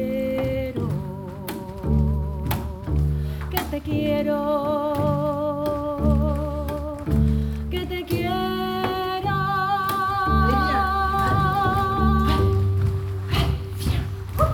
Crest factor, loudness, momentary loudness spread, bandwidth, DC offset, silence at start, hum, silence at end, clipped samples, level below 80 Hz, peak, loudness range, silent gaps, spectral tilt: 16 dB; -23 LUFS; 8 LU; 19 kHz; under 0.1%; 0 s; none; 0 s; under 0.1%; -30 dBFS; -6 dBFS; 5 LU; none; -7 dB/octave